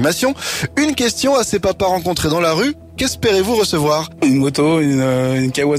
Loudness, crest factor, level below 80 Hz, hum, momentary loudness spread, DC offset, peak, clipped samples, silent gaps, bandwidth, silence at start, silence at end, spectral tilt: -16 LUFS; 10 dB; -42 dBFS; none; 4 LU; under 0.1%; -6 dBFS; under 0.1%; none; 16 kHz; 0 s; 0 s; -4.5 dB/octave